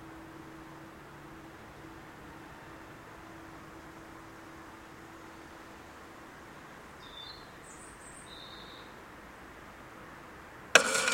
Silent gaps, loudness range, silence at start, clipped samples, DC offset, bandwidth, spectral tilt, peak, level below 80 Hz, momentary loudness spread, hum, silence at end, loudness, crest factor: none; 2 LU; 0 s; under 0.1%; under 0.1%; 16 kHz; -1 dB/octave; 0 dBFS; -62 dBFS; 4 LU; none; 0 s; -31 LUFS; 38 dB